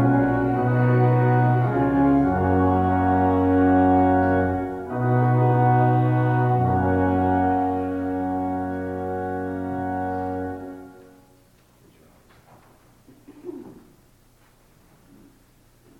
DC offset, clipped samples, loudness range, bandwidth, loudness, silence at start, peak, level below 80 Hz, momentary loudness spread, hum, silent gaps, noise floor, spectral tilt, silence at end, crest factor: under 0.1%; under 0.1%; 12 LU; 4 kHz; -21 LUFS; 0 s; -8 dBFS; -48 dBFS; 11 LU; none; none; -56 dBFS; -10.5 dB/octave; 2.25 s; 14 dB